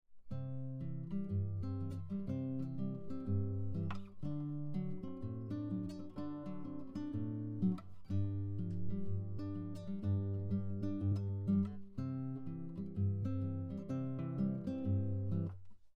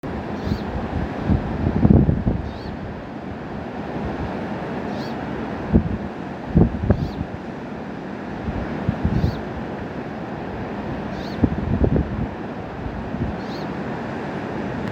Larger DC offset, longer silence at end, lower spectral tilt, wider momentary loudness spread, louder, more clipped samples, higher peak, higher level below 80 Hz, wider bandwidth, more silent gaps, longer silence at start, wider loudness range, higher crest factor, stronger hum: neither; about the same, 0.05 s vs 0 s; first, -10.5 dB/octave vs -9 dB/octave; second, 8 LU vs 12 LU; second, -41 LUFS vs -25 LUFS; neither; second, -24 dBFS vs 0 dBFS; second, -62 dBFS vs -32 dBFS; second, 5.4 kHz vs 8 kHz; neither; about the same, 0.1 s vs 0.05 s; about the same, 3 LU vs 5 LU; second, 14 dB vs 24 dB; neither